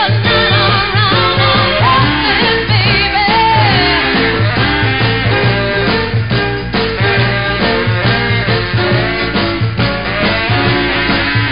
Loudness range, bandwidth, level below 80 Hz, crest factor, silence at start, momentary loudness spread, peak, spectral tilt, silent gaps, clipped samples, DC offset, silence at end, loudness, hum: 3 LU; 5.4 kHz; -28 dBFS; 12 dB; 0 s; 5 LU; 0 dBFS; -10.5 dB/octave; none; under 0.1%; 2%; 0 s; -11 LUFS; none